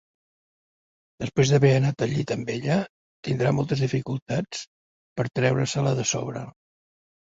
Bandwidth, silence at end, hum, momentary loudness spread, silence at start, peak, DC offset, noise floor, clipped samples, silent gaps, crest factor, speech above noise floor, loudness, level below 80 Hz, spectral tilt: 7.8 kHz; 0.8 s; none; 17 LU; 1.2 s; -6 dBFS; under 0.1%; under -90 dBFS; under 0.1%; 2.89-3.23 s, 4.22-4.26 s, 4.67-5.16 s; 20 dB; over 66 dB; -25 LUFS; -56 dBFS; -5.5 dB/octave